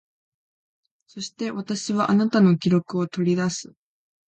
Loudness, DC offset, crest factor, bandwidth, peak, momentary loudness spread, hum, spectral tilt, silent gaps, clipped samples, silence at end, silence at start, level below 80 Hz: -22 LUFS; under 0.1%; 16 dB; 8.8 kHz; -8 dBFS; 13 LU; none; -6 dB/octave; none; under 0.1%; 0.7 s; 1.15 s; -66 dBFS